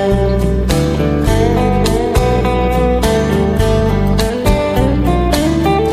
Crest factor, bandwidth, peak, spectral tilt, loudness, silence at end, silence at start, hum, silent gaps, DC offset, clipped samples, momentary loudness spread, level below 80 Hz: 12 dB; 15.5 kHz; 0 dBFS; -6.5 dB/octave; -14 LUFS; 0 s; 0 s; none; none; under 0.1%; under 0.1%; 1 LU; -18 dBFS